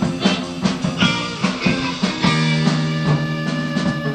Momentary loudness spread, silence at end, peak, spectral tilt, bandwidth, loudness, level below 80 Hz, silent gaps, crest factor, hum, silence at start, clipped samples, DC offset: 4 LU; 0 s; -2 dBFS; -5.5 dB/octave; 9.6 kHz; -19 LUFS; -44 dBFS; none; 16 dB; none; 0 s; under 0.1%; under 0.1%